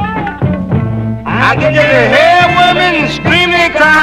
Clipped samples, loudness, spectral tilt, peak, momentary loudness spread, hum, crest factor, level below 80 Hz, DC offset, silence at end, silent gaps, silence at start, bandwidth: 0.4%; -9 LUFS; -5.5 dB/octave; 0 dBFS; 9 LU; none; 10 dB; -32 dBFS; under 0.1%; 0 s; none; 0 s; 15.5 kHz